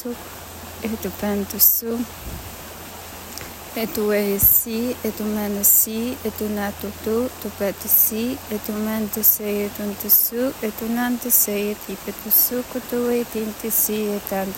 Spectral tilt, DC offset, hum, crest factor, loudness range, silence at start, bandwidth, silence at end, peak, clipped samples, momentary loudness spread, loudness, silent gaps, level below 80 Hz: -3.5 dB/octave; under 0.1%; none; 22 dB; 3 LU; 0 s; 17 kHz; 0 s; 0 dBFS; under 0.1%; 19 LU; -19 LUFS; none; -46 dBFS